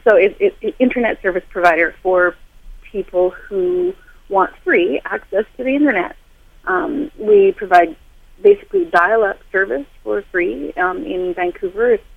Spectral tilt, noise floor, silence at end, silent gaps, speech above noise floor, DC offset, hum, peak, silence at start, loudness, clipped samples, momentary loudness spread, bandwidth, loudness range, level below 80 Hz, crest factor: -6.5 dB/octave; -37 dBFS; 0.15 s; none; 22 dB; under 0.1%; none; 0 dBFS; 0.05 s; -17 LUFS; under 0.1%; 9 LU; 8.2 kHz; 3 LU; -44 dBFS; 16 dB